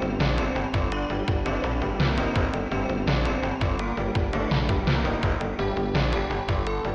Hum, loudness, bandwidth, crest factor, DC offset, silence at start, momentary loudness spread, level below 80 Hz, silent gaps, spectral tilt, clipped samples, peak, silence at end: none; -26 LUFS; 8.4 kHz; 12 dB; under 0.1%; 0 s; 3 LU; -30 dBFS; none; -7 dB/octave; under 0.1%; -12 dBFS; 0 s